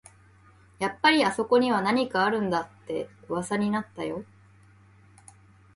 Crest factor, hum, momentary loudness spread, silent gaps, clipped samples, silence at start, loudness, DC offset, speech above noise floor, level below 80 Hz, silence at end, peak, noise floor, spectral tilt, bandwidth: 20 dB; none; 13 LU; none; under 0.1%; 0.8 s; -26 LUFS; under 0.1%; 30 dB; -64 dBFS; 1.5 s; -8 dBFS; -56 dBFS; -5 dB/octave; 11.5 kHz